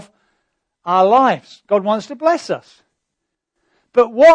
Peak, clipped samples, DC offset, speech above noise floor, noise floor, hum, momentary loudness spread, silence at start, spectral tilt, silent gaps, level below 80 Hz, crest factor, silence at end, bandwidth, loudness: -2 dBFS; under 0.1%; under 0.1%; 64 dB; -78 dBFS; none; 14 LU; 0.85 s; -5.5 dB/octave; none; -62 dBFS; 14 dB; 0 s; 9.6 kHz; -16 LUFS